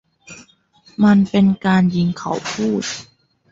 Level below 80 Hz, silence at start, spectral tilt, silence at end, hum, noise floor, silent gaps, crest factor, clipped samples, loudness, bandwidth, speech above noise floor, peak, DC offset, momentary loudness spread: -54 dBFS; 0.3 s; -6 dB/octave; 0.5 s; none; -52 dBFS; none; 14 dB; under 0.1%; -17 LUFS; 7.8 kHz; 37 dB; -4 dBFS; under 0.1%; 12 LU